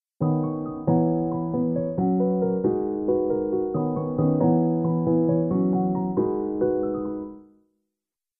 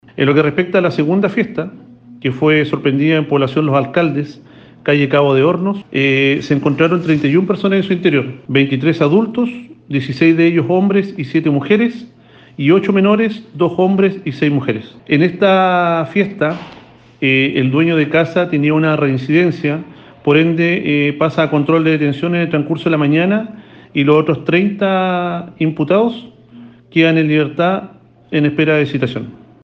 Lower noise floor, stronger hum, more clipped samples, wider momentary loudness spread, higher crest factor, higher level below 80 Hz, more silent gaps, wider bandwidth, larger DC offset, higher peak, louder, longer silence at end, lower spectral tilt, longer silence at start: first, -88 dBFS vs -39 dBFS; neither; neither; second, 5 LU vs 8 LU; about the same, 16 dB vs 14 dB; about the same, -54 dBFS vs -56 dBFS; neither; second, 2 kHz vs 6.8 kHz; neither; second, -8 dBFS vs 0 dBFS; second, -24 LUFS vs -14 LUFS; first, 0.95 s vs 0.3 s; first, -16 dB/octave vs -8 dB/octave; about the same, 0.2 s vs 0.15 s